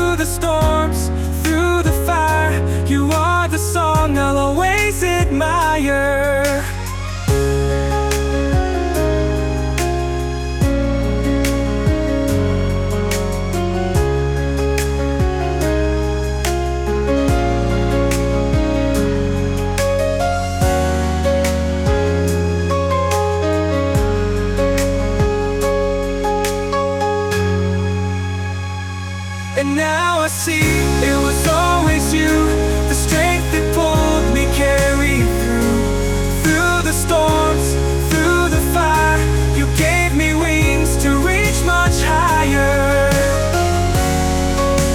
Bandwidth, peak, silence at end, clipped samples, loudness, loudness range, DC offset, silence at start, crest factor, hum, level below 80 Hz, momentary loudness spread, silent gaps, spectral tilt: 18.5 kHz; -4 dBFS; 0 s; under 0.1%; -17 LUFS; 4 LU; under 0.1%; 0 s; 12 dB; none; -22 dBFS; 5 LU; none; -5 dB/octave